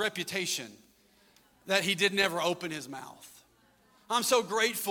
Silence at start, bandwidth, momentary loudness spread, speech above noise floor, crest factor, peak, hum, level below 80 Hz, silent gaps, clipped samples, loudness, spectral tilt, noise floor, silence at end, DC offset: 0 s; 17.5 kHz; 17 LU; 35 dB; 22 dB; -10 dBFS; none; -74 dBFS; none; under 0.1%; -29 LUFS; -2 dB/octave; -65 dBFS; 0 s; under 0.1%